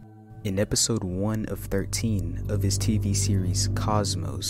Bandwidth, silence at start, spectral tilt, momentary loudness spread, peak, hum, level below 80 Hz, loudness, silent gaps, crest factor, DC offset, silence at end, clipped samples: 16 kHz; 0 s; -4.5 dB/octave; 7 LU; -10 dBFS; none; -38 dBFS; -26 LUFS; none; 16 dB; under 0.1%; 0 s; under 0.1%